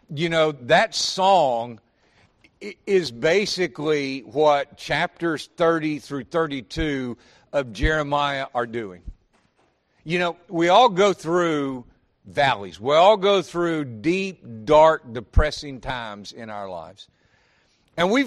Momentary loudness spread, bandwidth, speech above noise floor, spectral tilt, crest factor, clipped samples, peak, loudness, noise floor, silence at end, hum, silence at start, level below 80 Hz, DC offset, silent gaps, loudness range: 18 LU; 12.5 kHz; 43 dB; -4.5 dB/octave; 20 dB; under 0.1%; -2 dBFS; -21 LUFS; -65 dBFS; 0 s; none; 0.1 s; -36 dBFS; under 0.1%; none; 6 LU